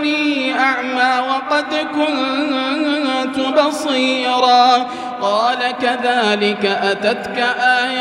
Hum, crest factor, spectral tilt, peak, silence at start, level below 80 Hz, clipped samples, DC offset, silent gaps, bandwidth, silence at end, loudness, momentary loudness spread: none; 16 dB; -3.5 dB/octave; 0 dBFS; 0 s; -62 dBFS; under 0.1%; under 0.1%; none; 12.5 kHz; 0 s; -16 LUFS; 5 LU